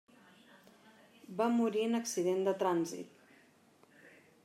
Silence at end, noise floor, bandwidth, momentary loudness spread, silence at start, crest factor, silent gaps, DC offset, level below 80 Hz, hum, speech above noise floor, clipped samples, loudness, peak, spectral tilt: 0.35 s; -65 dBFS; 16 kHz; 15 LU; 1.3 s; 18 dB; none; under 0.1%; under -90 dBFS; none; 33 dB; under 0.1%; -34 LUFS; -20 dBFS; -5 dB/octave